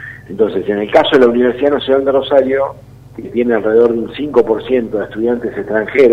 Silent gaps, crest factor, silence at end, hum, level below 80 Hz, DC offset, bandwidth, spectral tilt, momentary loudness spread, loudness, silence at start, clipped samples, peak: none; 14 dB; 0 s; none; -46 dBFS; under 0.1%; 7.6 kHz; -7 dB/octave; 9 LU; -14 LUFS; 0 s; 0.1%; 0 dBFS